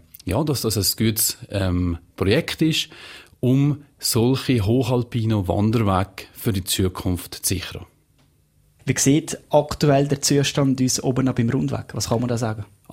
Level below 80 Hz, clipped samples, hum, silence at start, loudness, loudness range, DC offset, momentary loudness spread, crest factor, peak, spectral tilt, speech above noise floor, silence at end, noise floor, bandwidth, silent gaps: -46 dBFS; under 0.1%; none; 0.25 s; -21 LUFS; 4 LU; under 0.1%; 8 LU; 18 dB; -4 dBFS; -5 dB/octave; 39 dB; 0.3 s; -59 dBFS; 16.5 kHz; none